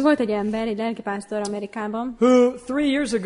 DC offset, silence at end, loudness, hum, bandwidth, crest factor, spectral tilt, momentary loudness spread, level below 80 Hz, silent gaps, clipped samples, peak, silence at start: under 0.1%; 0 s; -22 LUFS; none; 11 kHz; 16 dB; -5 dB/octave; 11 LU; -54 dBFS; none; under 0.1%; -6 dBFS; 0 s